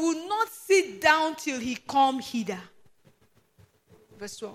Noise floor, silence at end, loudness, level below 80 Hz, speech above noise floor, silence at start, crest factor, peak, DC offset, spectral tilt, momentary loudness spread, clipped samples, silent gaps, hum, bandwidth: -64 dBFS; 0 s; -26 LUFS; -68 dBFS; 37 dB; 0 s; 22 dB; -6 dBFS; under 0.1%; -2.5 dB/octave; 17 LU; under 0.1%; none; none; 15.5 kHz